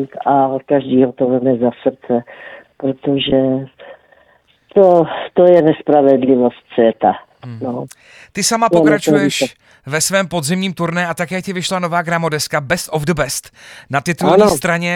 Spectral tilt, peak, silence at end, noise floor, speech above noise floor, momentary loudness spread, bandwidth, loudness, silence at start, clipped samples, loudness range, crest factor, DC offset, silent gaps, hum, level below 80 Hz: -4.5 dB/octave; 0 dBFS; 0 s; -53 dBFS; 39 dB; 12 LU; 19 kHz; -15 LUFS; 0 s; under 0.1%; 5 LU; 14 dB; under 0.1%; none; none; -48 dBFS